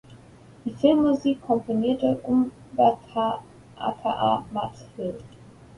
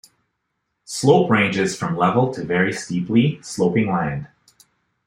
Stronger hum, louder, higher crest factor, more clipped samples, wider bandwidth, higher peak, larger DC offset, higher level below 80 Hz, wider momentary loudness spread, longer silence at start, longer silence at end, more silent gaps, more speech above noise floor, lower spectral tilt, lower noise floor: neither; second, -25 LUFS vs -19 LUFS; about the same, 20 dB vs 18 dB; neither; second, 11 kHz vs 15 kHz; second, -6 dBFS vs -2 dBFS; neither; about the same, -58 dBFS vs -56 dBFS; first, 13 LU vs 8 LU; second, 0.1 s vs 0.9 s; second, 0.5 s vs 0.8 s; neither; second, 25 dB vs 56 dB; first, -7.5 dB/octave vs -6 dB/octave; second, -49 dBFS vs -75 dBFS